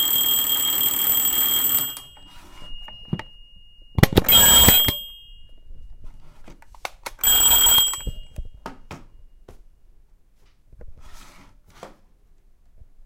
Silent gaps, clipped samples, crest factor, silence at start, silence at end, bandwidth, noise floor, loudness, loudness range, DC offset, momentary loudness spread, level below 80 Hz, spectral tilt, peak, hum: none; under 0.1%; 22 dB; 0 s; 1.2 s; 17.5 kHz; -54 dBFS; -15 LUFS; 5 LU; under 0.1%; 26 LU; -38 dBFS; -1.5 dB/octave; 0 dBFS; none